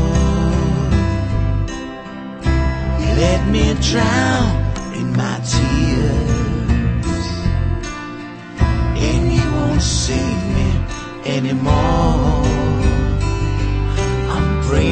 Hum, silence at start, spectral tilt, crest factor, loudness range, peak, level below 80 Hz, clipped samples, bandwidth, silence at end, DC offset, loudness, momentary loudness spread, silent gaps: none; 0 s; -6 dB/octave; 14 dB; 2 LU; -2 dBFS; -22 dBFS; under 0.1%; 8.8 kHz; 0 s; under 0.1%; -18 LUFS; 7 LU; none